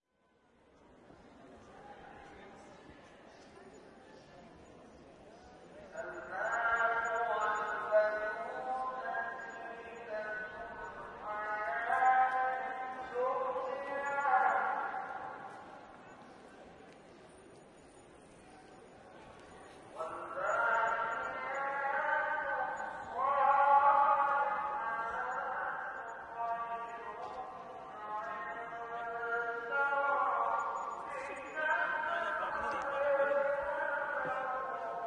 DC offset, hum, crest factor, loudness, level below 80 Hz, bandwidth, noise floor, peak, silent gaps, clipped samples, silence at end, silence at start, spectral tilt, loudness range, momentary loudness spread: under 0.1%; none; 20 dB; -35 LUFS; -72 dBFS; 10.5 kHz; -73 dBFS; -16 dBFS; none; under 0.1%; 0 s; 1.1 s; -4 dB/octave; 24 LU; 24 LU